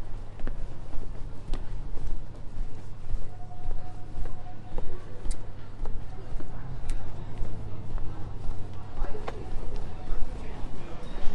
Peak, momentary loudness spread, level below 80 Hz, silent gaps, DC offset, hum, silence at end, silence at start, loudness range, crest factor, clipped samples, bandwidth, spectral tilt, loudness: -8 dBFS; 4 LU; -32 dBFS; none; under 0.1%; none; 0 s; 0 s; 2 LU; 16 dB; under 0.1%; 4.1 kHz; -6.5 dB/octave; -41 LUFS